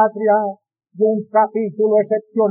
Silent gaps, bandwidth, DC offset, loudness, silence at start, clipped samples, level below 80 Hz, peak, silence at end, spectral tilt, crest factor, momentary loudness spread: none; 2.6 kHz; under 0.1%; -18 LUFS; 0 s; under 0.1%; under -90 dBFS; -4 dBFS; 0 s; -2.5 dB/octave; 14 dB; 4 LU